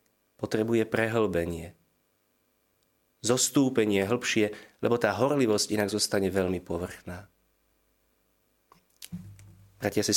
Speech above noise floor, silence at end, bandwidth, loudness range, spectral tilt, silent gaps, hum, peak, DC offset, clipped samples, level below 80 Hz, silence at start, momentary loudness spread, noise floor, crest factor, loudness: 45 dB; 0 s; 17 kHz; 11 LU; -4 dB/octave; none; none; -8 dBFS; under 0.1%; under 0.1%; -60 dBFS; 0.4 s; 18 LU; -72 dBFS; 22 dB; -27 LUFS